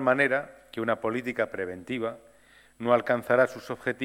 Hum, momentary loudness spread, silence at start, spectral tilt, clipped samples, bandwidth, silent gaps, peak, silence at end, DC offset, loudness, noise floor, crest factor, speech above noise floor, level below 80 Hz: none; 11 LU; 0 s; -6 dB/octave; under 0.1%; 15.5 kHz; none; -8 dBFS; 0 s; under 0.1%; -28 LUFS; -57 dBFS; 20 dB; 30 dB; -68 dBFS